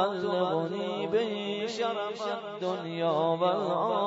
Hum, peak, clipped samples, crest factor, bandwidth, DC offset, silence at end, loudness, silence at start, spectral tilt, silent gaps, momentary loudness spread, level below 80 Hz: none; -14 dBFS; under 0.1%; 16 dB; 8 kHz; under 0.1%; 0 s; -30 LUFS; 0 s; -6 dB/octave; none; 6 LU; -78 dBFS